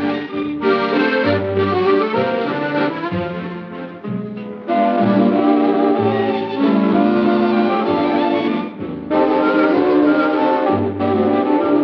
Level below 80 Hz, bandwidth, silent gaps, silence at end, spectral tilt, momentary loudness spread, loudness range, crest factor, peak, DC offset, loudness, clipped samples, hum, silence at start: -56 dBFS; 5.8 kHz; none; 0 s; -9 dB/octave; 11 LU; 4 LU; 14 dB; -2 dBFS; under 0.1%; -17 LUFS; under 0.1%; none; 0 s